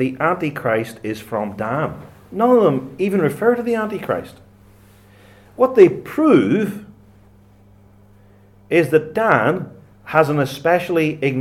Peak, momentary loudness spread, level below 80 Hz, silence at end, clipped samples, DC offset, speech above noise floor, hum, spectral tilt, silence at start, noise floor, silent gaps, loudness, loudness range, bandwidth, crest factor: 0 dBFS; 12 LU; -56 dBFS; 0 s; under 0.1%; under 0.1%; 32 dB; none; -7 dB/octave; 0 s; -49 dBFS; none; -18 LUFS; 3 LU; 16 kHz; 18 dB